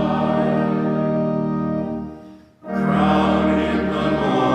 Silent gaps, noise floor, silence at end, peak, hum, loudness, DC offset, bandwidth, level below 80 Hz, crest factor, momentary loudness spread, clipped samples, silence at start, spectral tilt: none; -42 dBFS; 0 s; -6 dBFS; none; -20 LUFS; under 0.1%; 8.8 kHz; -42 dBFS; 14 dB; 11 LU; under 0.1%; 0 s; -8 dB/octave